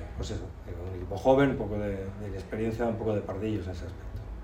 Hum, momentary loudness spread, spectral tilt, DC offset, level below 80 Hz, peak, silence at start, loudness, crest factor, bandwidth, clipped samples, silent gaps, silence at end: none; 16 LU; -7.5 dB/octave; under 0.1%; -44 dBFS; -10 dBFS; 0 s; -31 LUFS; 20 dB; 16 kHz; under 0.1%; none; 0 s